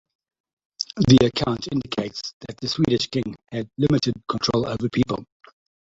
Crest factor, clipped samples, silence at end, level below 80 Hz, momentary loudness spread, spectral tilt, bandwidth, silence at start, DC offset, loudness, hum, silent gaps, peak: 20 dB; under 0.1%; 0.7 s; -48 dBFS; 15 LU; -6 dB/octave; 7.8 kHz; 0.8 s; under 0.1%; -23 LUFS; none; 2.33-2.40 s; -2 dBFS